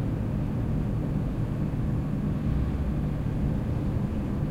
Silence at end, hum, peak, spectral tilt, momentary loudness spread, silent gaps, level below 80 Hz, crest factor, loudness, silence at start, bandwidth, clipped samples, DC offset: 0 s; none; -16 dBFS; -9.5 dB/octave; 1 LU; none; -34 dBFS; 12 dB; -29 LUFS; 0 s; 8.6 kHz; under 0.1%; under 0.1%